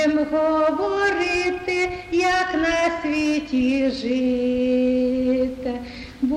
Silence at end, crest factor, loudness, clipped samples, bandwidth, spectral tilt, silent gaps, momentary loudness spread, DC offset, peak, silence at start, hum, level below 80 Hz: 0 s; 12 dB; -21 LUFS; under 0.1%; 11 kHz; -4.5 dB/octave; none; 4 LU; under 0.1%; -10 dBFS; 0 s; none; -46 dBFS